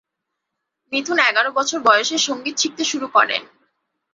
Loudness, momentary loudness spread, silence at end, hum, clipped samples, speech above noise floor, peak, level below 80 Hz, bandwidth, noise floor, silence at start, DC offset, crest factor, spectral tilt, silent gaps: -18 LUFS; 8 LU; 0.7 s; none; under 0.1%; 61 dB; -2 dBFS; -72 dBFS; 8 kHz; -79 dBFS; 0.9 s; under 0.1%; 20 dB; 0 dB/octave; none